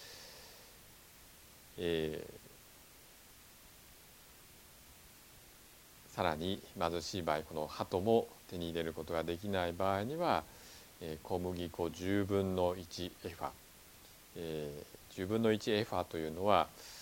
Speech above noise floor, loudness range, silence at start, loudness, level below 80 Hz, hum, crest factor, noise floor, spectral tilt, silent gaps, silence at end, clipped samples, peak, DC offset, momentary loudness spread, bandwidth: 23 dB; 9 LU; 0 s; -37 LUFS; -64 dBFS; none; 24 dB; -59 dBFS; -5.5 dB/octave; none; 0 s; under 0.1%; -14 dBFS; under 0.1%; 24 LU; 17.5 kHz